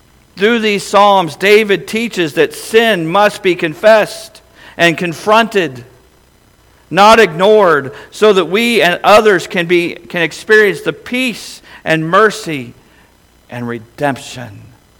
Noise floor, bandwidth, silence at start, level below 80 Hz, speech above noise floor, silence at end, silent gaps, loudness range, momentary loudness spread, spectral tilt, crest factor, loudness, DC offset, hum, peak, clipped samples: -48 dBFS; 18.5 kHz; 0.35 s; -50 dBFS; 37 dB; 0.4 s; none; 7 LU; 16 LU; -4.5 dB/octave; 12 dB; -11 LUFS; under 0.1%; none; 0 dBFS; 0.3%